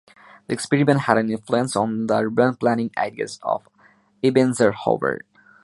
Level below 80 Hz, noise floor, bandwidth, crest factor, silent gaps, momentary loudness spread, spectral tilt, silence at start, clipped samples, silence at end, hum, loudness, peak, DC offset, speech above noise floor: -62 dBFS; -57 dBFS; 11.5 kHz; 20 dB; none; 9 LU; -6 dB/octave; 0.5 s; under 0.1%; 0.45 s; none; -21 LUFS; -2 dBFS; under 0.1%; 36 dB